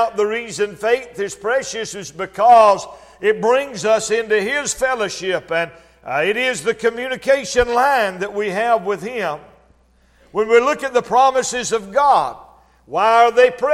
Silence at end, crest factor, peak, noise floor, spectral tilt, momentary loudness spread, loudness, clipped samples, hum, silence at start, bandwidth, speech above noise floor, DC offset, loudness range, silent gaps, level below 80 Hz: 0 s; 18 dB; 0 dBFS; -55 dBFS; -2.5 dB/octave; 12 LU; -17 LUFS; under 0.1%; none; 0 s; 14.5 kHz; 38 dB; under 0.1%; 3 LU; none; -48 dBFS